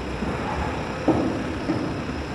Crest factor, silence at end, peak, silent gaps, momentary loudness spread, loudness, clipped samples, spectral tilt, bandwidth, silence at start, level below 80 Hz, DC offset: 20 dB; 0 s; -6 dBFS; none; 5 LU; -26 LUFS; under 0.1%; -6.5 dB/octave; 12.5 kHz; 0 s; -38 dBFS; under 0.1%